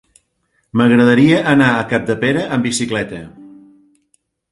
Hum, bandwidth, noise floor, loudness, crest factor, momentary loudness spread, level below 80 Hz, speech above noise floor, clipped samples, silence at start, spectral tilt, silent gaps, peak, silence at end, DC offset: none; 11.5 kHz; -65 dBFS; -14 LUFS; 16 dB; 12 LU; -50 dBFS; 51 dB; under 0.1%; 0.75 s; -5.5 dB/octave; none; 0 dBFS; 1.05 s; under 0.1%